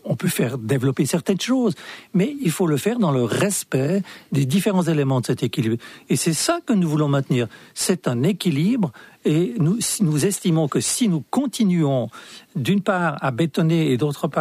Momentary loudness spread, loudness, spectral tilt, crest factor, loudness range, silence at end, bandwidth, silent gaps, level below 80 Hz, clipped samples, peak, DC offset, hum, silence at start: 6 LU; -21 LUFS; -5.5 dB/octave; 14 dB; 1 LU; 0 s; 15.5 kHz; none; -62 dBFS; under 0.1%; -8 dBFS; under 0.1%; none; 0.05 s